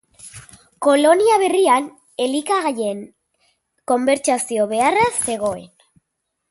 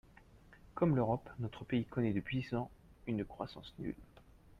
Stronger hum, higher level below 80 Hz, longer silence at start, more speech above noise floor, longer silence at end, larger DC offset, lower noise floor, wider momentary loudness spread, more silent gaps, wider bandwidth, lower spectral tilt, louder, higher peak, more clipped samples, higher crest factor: neither; about the same, -58 dBFS vs -60 dBFS; about the same, 0.25 s vs 0.35 s; first, 59 dB vs 24 dB; first, 0.85 s vs 0.55 s; neither; first, -76 dBFS vs -61 dBFS; first, 19 LU vs 14 LU; neither; first, 12 kHz vs 10 kHz; second, -3 dB/octave vs -9 dB/octave; first, -18 LUFS vs -38 LUFS; first, -2 dBFS vs -20 dBFS; neither; about the same, 18 dB vs 20 dB